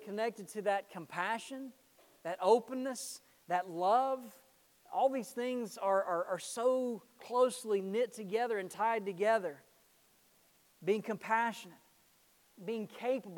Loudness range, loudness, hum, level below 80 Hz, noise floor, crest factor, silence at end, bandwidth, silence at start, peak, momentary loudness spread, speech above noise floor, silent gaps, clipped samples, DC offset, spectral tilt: 4 LU; -35 LUFS; none; -88 dBFS; -69 dBFS; 22 dB; 0 s; 19 kHz; 0 s; -14 dBFS; 13 LU; 34 dB; none; under 0.1%; under 0.1%; -4 dB/octave